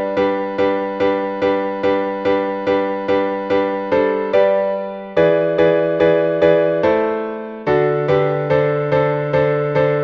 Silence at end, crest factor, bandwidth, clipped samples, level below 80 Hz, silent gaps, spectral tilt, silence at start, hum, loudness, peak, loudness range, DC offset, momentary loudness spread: 0 s; 14 dB; 6.2 kHz; under 0.1%; -50 dBFS; none; -8 dB/octave; 0 s; none; -17 LUFS; -2 dBFS; 3 LU; under 0.1%; 4 LU